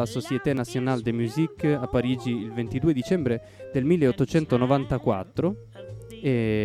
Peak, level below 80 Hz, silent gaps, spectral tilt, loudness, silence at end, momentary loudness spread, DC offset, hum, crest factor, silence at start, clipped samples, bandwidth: -6 dBFS; -50 dBFS; none; -7.5 dB/octave; -25 LUFS; 0 s; 8 LU; under 0.1%; none; 18 dB; 0 s; under 0.1%; 14 kHz